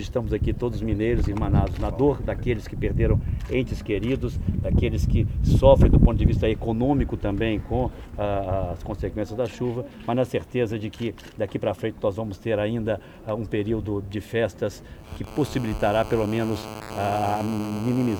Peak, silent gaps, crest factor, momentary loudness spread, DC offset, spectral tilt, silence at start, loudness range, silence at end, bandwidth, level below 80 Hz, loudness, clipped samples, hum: -2 dBFS; none; 20 dB; 9 LU; under 0.1%; -8 dB/octave; 0 s; 7 LU; 0 s; 19.5 kHz; -30 dBFS; -25 LUFS; under 0.1%; none